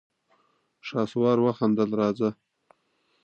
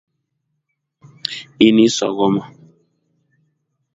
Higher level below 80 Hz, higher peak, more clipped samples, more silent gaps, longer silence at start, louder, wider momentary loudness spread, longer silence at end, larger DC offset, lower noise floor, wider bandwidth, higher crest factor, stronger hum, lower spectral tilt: second, -70 dBFS vs -60 dBFS; second, -10 dBFS vs 0 dBFS; neither; neither; second, 0.85 s vs 1.25 s; second, -25 LUFS vs -16 LUFS; second, 8 LU vs 15 LU; second, 0.9 s vs 1.5 s; neither; second, -70 dBFS vs -74 dBFS; about the same, 7.6 kHz vs 8 kHz; about the same, 18 dB vs 20 dB; neither; first, -8 dB/octave vs -4.5 dB/octave